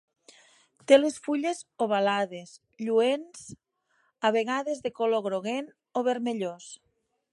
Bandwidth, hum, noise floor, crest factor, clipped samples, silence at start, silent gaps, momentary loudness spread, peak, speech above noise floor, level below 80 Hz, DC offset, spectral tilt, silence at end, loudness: 11.5 kHz; none; -71 dBFS; 24 dB; under 0.1%; 0.9 s; none; 22 LU; -6 dBFS; 44 dB; -76 dBFS; under 0.1%; -4 dB/octave; 0.6 s; -27 LUFS